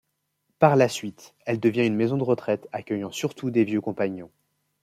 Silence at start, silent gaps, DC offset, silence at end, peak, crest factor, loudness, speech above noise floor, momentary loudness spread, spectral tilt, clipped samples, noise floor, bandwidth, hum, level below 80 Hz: 0.6 s; none; under 0.1%; 0.55 s; -2 dBFS; 22 dB; -24 LUFS; 51 dB; 11 LU; -6.5 dB/octave; under 0.1%; -75 dBFS; 15.5 kHz; none; -68 dBFS